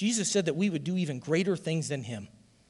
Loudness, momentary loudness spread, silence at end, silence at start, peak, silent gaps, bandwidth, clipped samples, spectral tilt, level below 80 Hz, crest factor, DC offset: -30 LUFS; 9 LU; 0.4 s; 0 s; -14 dBFS; none; 12 kHz; under 0.1%; -4.5 dB/octave; -70 dBFS; 16 dB; under 0.1%